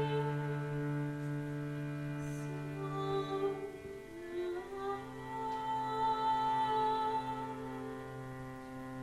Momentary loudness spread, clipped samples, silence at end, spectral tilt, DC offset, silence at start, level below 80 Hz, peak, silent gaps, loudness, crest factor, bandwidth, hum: 13 LU; under 0.1%; 0 s; -7 dB/octave; under 0.1%; 0 s; -64 dBFS; -24 dBFS; none; -38 LUFS; 14 dB; 13.5 kHz; none